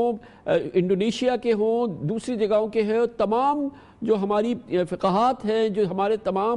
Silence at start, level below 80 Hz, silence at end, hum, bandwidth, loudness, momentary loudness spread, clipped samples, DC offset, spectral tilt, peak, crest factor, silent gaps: 0 s; -58 dBFS; 0 s; none; 11 kHz; -24 LUFS; 5 LU; under 0.1%; under 0.1%; -6.5 dB/octave; -10 dBFS; 14 dB; none